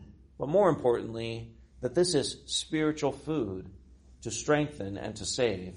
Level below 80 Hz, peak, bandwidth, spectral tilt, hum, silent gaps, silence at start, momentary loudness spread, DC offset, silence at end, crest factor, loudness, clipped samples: -56 dBFS; -12 dBFS; 10.5 kHz; -4.5 dB/octave; none; none; 0 s; 13 LU; under 0.1%; 0 s; 18 dB; -30 LUFS; under 0.1%